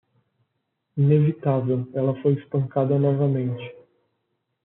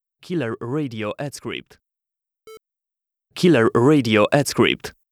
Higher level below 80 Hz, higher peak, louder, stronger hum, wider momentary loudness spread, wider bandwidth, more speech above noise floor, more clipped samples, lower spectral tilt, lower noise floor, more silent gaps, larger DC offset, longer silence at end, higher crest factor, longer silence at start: second, -68 dBFS vs -58 dBFS; second, -8 dBFS vs -2 dBFS; second, -22 LUFS vs -19 LUFS; neither; second, 10 LU vs 15 LU; second, 3.8 kHz vs 15.5 kHz; second, 55 dB vs 68 dB; neither; first, -10 dB/octave vs -5.5 dB/octave; second, -76 dBFS vs -87 dBFS; neither; neither; first, 0.9 s vs 0.2 s; about the same, 16 dB vs 20 dB; first, 0.95 s vs 0.3 s